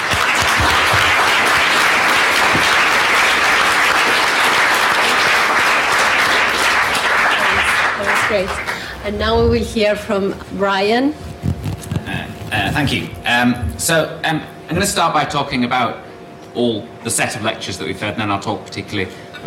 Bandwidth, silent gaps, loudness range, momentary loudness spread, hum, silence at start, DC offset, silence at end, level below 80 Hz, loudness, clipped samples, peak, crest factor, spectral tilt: 16.5 kHz; none; 7 LU; 12 LU; none; 0 s; under 0.1%; 0 s; -38 dBFS; -15 LUFS; under 0.1%; -4 dBFS; 12 dB; -3 dB/octave